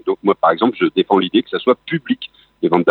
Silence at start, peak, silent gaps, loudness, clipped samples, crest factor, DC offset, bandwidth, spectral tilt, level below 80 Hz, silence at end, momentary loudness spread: 0.05 s; 0 dBFS; none; -17 LUFS; under 0.1%; 16 dB; under 0.1%; 4.5 kHz; -8.5 dB/octave; -64 dBFS; 0 s; 8 LU